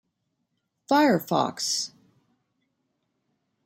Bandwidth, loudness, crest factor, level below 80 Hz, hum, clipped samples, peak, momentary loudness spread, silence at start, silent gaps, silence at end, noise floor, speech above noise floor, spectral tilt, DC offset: 16 kHz; -24 LUFS; 20 dB; -76 dBFS; none; under 0.1%; -8 dBFS; 7 LU; 0.9 s; none; 1.8 s; -78 dBFS; 54 dB; -3.5 dB/octave; under 0.1%